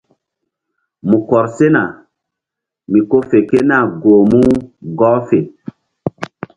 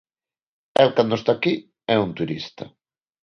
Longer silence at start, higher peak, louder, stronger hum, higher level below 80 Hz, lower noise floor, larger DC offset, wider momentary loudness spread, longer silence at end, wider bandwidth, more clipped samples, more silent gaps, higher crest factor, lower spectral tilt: first, 1.05 s vs 0.8 s; about the same, 0 dBFS vs -2 dBFS; first, -13 LUFS vs -21 LUFS; neither; first, -46 dBFS vs -60 dBFS; second, -82 dBFS vs under -90 dBFS; neither; about the same, 16 LU vs 16 LU; second, 0.3 s vs 0.55 s; second, 9.4 kHz vs 10.5 kHz; neither; neither; second, 14 dB vs 22 dB; first, -8.5 dB/octave vs -6.5 dB/octave